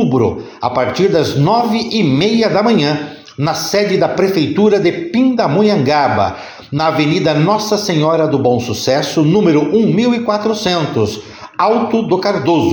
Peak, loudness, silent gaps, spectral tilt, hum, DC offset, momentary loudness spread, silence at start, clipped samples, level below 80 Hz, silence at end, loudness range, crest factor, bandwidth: -2 dBFS; -14 LUFS; none; -6 dB/octave; none; under 0.1%; 6 LU; 0 s; under 0.1%; -50 dBFS; 0 s; 1 LU; 12 dB; 19 kHz